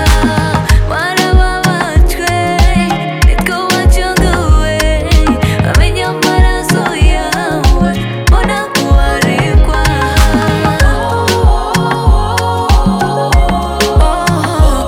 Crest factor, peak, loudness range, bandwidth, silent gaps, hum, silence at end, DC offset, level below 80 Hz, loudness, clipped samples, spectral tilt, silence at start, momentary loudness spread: 10 dB; 0 dBFS; 1 LU; 16.5 kHz; none; none; 0 s; under 0.1%; -12 dBFS; -11 LUFS; 0.3%; -5 dB/octave; 0 s; 3 LU